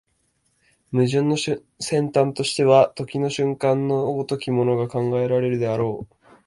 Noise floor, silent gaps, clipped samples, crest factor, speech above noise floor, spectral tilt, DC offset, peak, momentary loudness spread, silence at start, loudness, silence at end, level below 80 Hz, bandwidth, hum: -68 dBFS; none; under 0.1%; 20 dB; 47 dB; -6 dB/octave; under 0.1%; -2 dBFS; 9 LU; 0.9 s; -21 LUFS; 0.4 s; -60 dBFS; 11.5 kHz; none